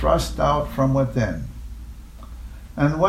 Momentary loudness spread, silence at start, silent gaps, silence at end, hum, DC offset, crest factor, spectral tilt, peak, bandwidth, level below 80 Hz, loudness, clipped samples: 20 LU; 0 s; none; 0 s; none; under 0.1%; 18 dB; -7 dB/octave; -4 dBFS; 15.5 kHz; -32 dBFS; -22 LUFS; under 0.1%